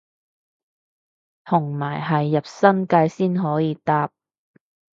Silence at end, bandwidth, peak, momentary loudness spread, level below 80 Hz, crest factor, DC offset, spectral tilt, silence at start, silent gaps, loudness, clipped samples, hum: 0.9 s; 7.6 kHz; -2 dBFS; 6 LU; -68 dBFS; 20 dB; under 0.1%; -8 dB/octave; 1.45 s; none; -21 LUFS; under 0.1%; none